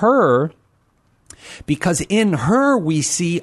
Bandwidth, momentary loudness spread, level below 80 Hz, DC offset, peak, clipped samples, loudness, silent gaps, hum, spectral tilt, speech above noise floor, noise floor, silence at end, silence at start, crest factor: 12.5 kHz; 11 LU; -48 dBFS; under 0.1%; -4 dBFS; under 0.1%; -17 LUFS; none; none; -5 dB/octave; 43 dB; -60 dBFS; 0 s; 0 s; 14 dB